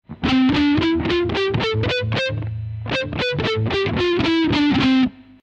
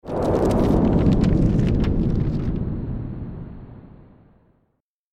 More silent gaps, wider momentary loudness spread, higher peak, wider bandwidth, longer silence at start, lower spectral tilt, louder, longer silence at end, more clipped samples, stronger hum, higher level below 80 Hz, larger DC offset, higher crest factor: neither; second, 7 LU vs 18 LU; about the same, -6 dBFS vs -6 dBFS; second, 8.2 kHz vs 11.5 kHz; about the same, 0.1 s vs 0.05 s; second, -6.5 dB/octave vs -9 dB/octave; about the same, -19 LUFS vs -21 LUFS; second, 0.2 s vs 1.2 s; neither; neither; second, -40 dBFS vs -28 dBFS; neither; about the same, 14 dB vs 16 dB